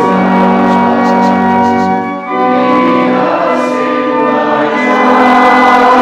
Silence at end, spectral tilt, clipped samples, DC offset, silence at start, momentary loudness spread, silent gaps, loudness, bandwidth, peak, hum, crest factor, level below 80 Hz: 0 s; -6.5 dB/octave; 1%; under 0.1%; 0 s; 6 LU; none; -9 LUFS; 10 kHz; 0 dBFS; none; 8 dB; -50 dBFS